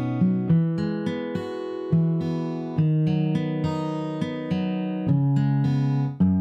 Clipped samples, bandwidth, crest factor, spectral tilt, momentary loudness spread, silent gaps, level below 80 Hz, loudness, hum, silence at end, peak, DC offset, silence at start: under 0.1%; 7.6 kHz; 12 dB; -9.5 dB/octave; 7 LU; none; -58 dBFS; -24 LUFS; none; 0 s; -10 dBFS; under 0.1%; 0 s